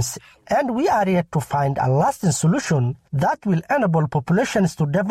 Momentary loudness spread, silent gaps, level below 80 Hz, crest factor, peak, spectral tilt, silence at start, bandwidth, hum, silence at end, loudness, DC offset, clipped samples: 4 LU; none; -52 dBFS; 10 dB; -10 dBFS; -6 dB/octave; 0 s; 14.5 kHz; none; 0 s; -20 LUFS; under 0.1%; under 0.1%